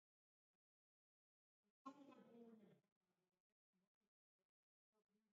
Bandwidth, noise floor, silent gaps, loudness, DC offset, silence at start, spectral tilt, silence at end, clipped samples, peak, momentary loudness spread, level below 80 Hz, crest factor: 4.9 kHz; under -90 dBFS; 1.70-1.85 s, 2.92-3.01 s, 3.40-3.73 s, 3.87-4.01 s, 4.08-4.39 s, 4.45-4.93 s, 5.02-5.07 s; -66 LUFS; under 0.1%; 1.65 s; -5.5 dB/octave; 0.15 s; under 0.1%; -46 dBFS; 4 LU; under -90 dBFS; 26 dB